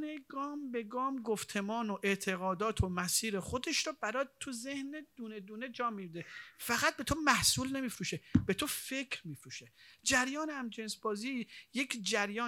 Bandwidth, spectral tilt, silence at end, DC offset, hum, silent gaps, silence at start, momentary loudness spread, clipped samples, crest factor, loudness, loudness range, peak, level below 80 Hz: over 20 kHz; -3 dB/octave; 0 s; under 0.1%; none; none; 0 s; 14 LU; under 0.1%; 26 dB; -35 LUFS; 5 LU; -10 dBFS; -58 dBFS